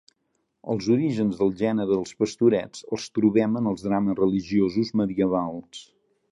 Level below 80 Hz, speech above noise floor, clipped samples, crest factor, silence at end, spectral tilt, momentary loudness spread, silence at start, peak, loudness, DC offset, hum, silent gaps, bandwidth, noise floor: -58 dBFS; 51 dB; under 0.1%; 16 dB; 0.5 s; -7 dB/octave; 11 LU; 0.65 s; -8 dBFS; -24 LUFS; under 0.1%; none; none; 11 kHz; -74 dBFS